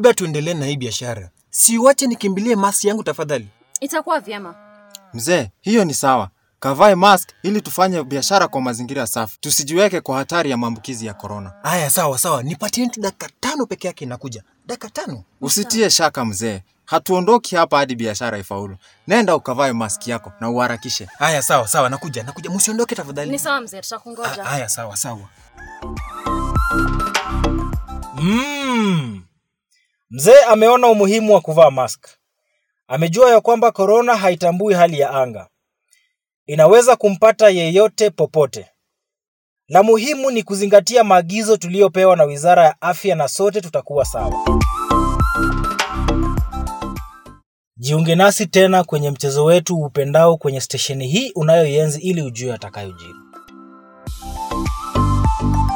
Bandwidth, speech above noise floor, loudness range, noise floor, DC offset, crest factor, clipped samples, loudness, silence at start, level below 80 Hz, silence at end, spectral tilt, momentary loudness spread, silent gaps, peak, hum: 17.5 kHz; 62 dB; 8 LU; -78 dBFS; under 0.1%; 16 dB; under 0.1%; -16 LUFS; 0 s; -32 dBFS; 0 s; -4.5 dB/octave; 17 LU; 36.34-36.46 s, 39.28-39.56 s, 47.46-47.71 s; 0 dBFS; none